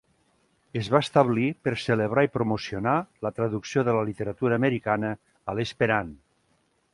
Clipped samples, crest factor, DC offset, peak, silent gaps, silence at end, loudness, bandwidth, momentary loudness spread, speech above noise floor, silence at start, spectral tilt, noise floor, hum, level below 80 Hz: under 0.1%; 22 dB; under 0.1%; -4 dBFS; none; 0.8 s; -26 LUFS; 11.5 kHz; 11 LU; 43 dB; 0.75 s; -6.5 dB/octave; -69 dBFS; none; -58 dBFS